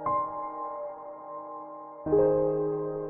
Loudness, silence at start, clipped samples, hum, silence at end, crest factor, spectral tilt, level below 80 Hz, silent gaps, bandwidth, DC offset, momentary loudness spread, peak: -29 LUFS; 0 s; under 0.1%; none; 0 s; 16 dB; -11.5 dB/octave; -56 dBFS; none; 2.7 kHz; under 0.1%; 17 LU; -14 dBFS